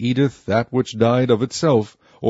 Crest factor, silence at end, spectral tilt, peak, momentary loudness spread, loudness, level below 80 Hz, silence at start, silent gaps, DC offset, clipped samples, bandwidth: 16 dB; 0 s; -6.5 dB/octave; -2 dBFS; 5 LU; -19 LUFS; -56 dBFS; 0 s; none; under 0.1%; under 0.1%; 8 kHz